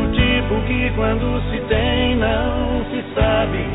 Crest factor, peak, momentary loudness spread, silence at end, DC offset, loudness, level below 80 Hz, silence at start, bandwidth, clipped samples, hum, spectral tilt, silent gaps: 14 dB; -4 dBFS; 5 LU; 0 s; 0.3%; -19 LUFS; -24 dBFS; 0 s; 4 kHz; under 0.1%; none; -10 dB/octave; none